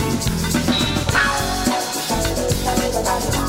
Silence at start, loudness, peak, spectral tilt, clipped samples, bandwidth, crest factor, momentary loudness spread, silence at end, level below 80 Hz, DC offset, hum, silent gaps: 0 s; -19 LUFS; -4 dBFS; -3.5 dB/octave; under 0.1%; 16.5 kHz; 16 dB; 3 LU; 0 s; -30 dBFS; under 0.1%; none; none